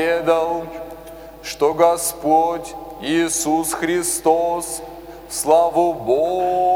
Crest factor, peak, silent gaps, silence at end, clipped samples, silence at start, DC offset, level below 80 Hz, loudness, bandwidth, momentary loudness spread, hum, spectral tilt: 16 dB; -2 dBFS; none; 0 s; under 0.1%; 0 s; under 0.1%; -48 dBFS; -19 LUFS; 17.5 kHz; 17 LU; none; -3.5 dB/octave